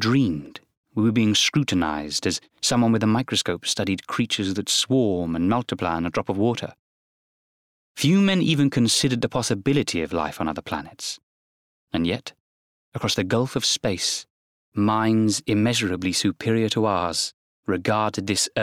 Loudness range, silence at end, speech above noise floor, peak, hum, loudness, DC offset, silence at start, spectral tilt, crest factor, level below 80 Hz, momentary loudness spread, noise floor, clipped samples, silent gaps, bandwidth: 5 LU; 0 s; over 68 dB; -10 dBFS; none; -23 LUFS; under 0.1%; 0 s; -4.5 dB/octave; 14 dB; -56 dBFS; 11 LU; under -90 dBFS; under 0.1%; 0.77-0.84 s, 6.79-7.95 s, 11.23-11.87 s, 12.40-12.92 s, 14.30-14.72 s, 17.34-17.63 s; 16 kHz